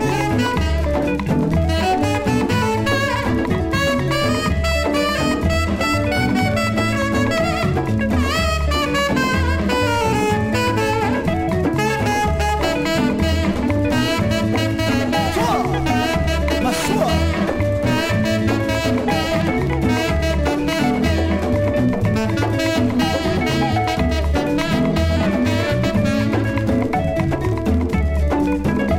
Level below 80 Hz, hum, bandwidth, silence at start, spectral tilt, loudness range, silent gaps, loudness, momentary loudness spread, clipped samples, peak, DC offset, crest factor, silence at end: -28 dBFS; none; 16 kHz; 0 s; -6 dB/octave; 0 LU; none; -18 LUFS; 2 LU; under 0.1%; -4 dBFS; under 0.1%; 12 dB; 0 s